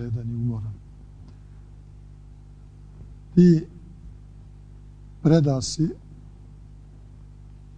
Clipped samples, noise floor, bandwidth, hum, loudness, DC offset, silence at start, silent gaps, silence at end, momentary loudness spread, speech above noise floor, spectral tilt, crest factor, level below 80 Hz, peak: under 0.1%; -45 dBFS; 9.2 kHz; 50 Hz at -45 dBFS; -22 LUFS; under 0.1%; 0 s; none; 1.8 s; 29 LU; 25 dB; -7.5 dB/octave; 22 dB; -46 dBFS; -4 dBFS